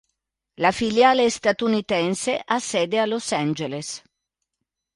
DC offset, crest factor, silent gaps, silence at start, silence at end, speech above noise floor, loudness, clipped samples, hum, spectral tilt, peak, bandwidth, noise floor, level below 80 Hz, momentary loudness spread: under 0.1%; 18 dB; none; 0.6 s; 1 s; 60 dB; -22 LUFS; under 0.1%; none; -4 dB/octave; -6 dBFS; 11.5 kHz; -82 dBFS; -60 dBFS; 11 LU